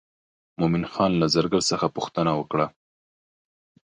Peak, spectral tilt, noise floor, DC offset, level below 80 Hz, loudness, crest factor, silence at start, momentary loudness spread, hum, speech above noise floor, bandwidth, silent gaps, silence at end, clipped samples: -6 dBFS; -5 dB/octave; under -90 dBFS; under 0.1%; -54 dBFS; -24 LUFS; 18 dB; 0.6 s; 6 LU; none; over 67 dB; 10.5 kHz; none; 1.25 s; under 0.1%